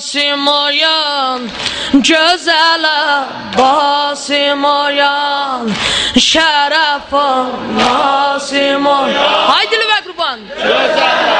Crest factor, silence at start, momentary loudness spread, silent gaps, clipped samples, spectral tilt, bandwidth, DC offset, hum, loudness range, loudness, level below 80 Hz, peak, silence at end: 12 dB; 0 s; 7 LU; none; under 0.1%; -2 dB/octave; 10 kHz; under 0.1%; none; 1 LU; -11 LUFS; -46 dBFS; 0 dBFS; 0 s